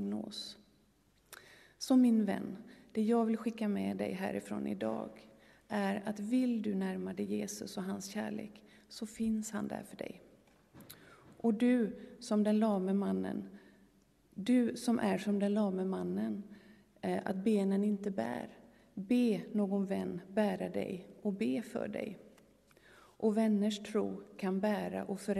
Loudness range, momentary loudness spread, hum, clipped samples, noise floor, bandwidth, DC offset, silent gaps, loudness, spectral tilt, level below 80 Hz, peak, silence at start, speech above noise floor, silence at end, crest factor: 5 LU; 16 LU; none; under 0.1%; -70 dBFS; 13.5 kHz; under 0.1%; none; -35 LUFS; -6.5 dB/octave; -74 dBFS; -18 dBFS; 0 s; 36 dB; 0 s; 16 dB